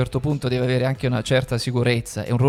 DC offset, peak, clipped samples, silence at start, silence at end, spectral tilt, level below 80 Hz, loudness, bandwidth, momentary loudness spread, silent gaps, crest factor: under 0.1%; -4 dBFS; under 0.1%; 0 s; 0 s; -6 dB/octave; -44 dBFS; -22 LUFS; 14 kHz; 3 LU; none; 18 dB